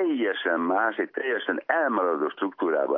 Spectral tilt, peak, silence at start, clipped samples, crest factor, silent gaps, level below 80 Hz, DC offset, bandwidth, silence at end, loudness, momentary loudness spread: -8 dB/octave; -8 dBFS; 0 s; under 0.1%; 16 dB; none; under -90 dBFS; under 0.1%; 3.9 kHz; 0 s; -26 LUFS; 4 LU